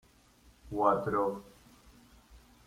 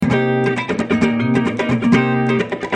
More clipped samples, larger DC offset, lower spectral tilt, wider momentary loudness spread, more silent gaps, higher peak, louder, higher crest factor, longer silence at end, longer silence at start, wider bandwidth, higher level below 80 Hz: neither; neither; about the same, -7.5 dB/octave vs -7 dB/octave; first, 14 LU vs 4 LU; neither; second, -12 dBFS vs -2 dBFS; second, -31 LUFS vs -17 LUFS; first, 22 dB vs 16 dB; first, 0.3 s vs 0 s; first, 0.65 s vs 0 s; first, 16 kHz vs 9.4 kHz; second, -60 dBFS vs -46 dBFS